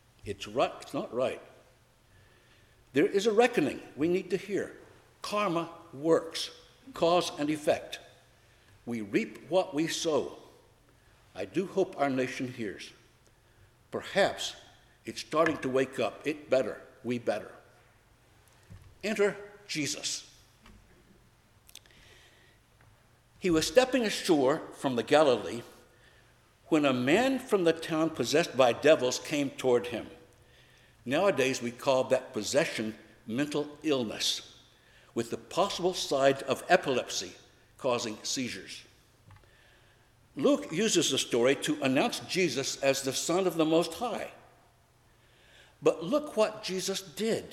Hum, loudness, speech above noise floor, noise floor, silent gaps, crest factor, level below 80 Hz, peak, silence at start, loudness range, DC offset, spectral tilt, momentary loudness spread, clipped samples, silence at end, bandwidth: none; -29 LUFS; 34 dB; -63 dBFS; none; 24 dB; -66 dBFS; -8 dBFS; 0.25 s; 7 LU; under 0.1%; -4 dB/octave; 14 LU; under 0.1%; 0 s; 16 kHz